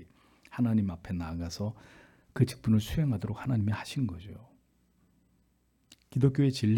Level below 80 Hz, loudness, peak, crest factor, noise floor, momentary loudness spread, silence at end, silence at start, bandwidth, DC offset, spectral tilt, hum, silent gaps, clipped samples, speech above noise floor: -54 dBFS; -31 LUFS; -12 dBFS; 20 dB; -70 dBFS; 17 LU; 0 s; 0 s; 17.5 kHz; under 0.1%; -7.5 dB/octave; none; none; under 0.1%; 41 dB